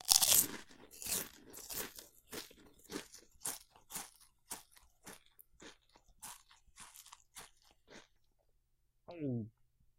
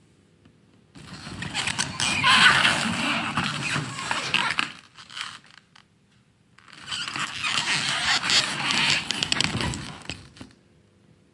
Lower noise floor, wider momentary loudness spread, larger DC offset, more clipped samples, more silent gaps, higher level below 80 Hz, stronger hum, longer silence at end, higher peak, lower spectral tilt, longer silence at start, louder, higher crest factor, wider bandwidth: first, -77 dBFS vs -61 dBFS; first, 22 LU vs 19 LU; neither; neither; neither; second, -70 dBFS vs -54 dBFS; neither; second, 0.5 s vs 0.9 s; second, -6 dBFS vs -2 dBFS; about the same, -1 dB/octave vs -1.5 dB/octave; second, 0.05 s vs 0.95 s; second, -36 LUFS vs -22 LUFS; first, 36 dB vs 26 dB; first, 16.5 kHz vs 11.5 kHz